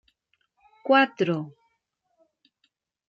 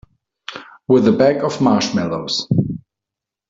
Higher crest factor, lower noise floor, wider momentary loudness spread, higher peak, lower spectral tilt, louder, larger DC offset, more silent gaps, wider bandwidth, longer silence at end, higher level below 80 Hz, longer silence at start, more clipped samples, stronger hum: about the same, 20 dB vs 16 dB; second, -76 dBFS vs -85 dBFS; about the same, 18 LU vs 19 LU; second, -8 dBFS vs -2 dBFS; about the same, -6.5 dB/octave vs -6 dB/octave; second, -23 LUFS vs -17 LUFS; neither; neither; about the same, 7.4 kHz vs 7.8 kHz; first, 1.6 s vs 0.7 s; second, -80 dBFS vs -52 dBFS; first, 0.85 s vs 0.5 s; neither; neither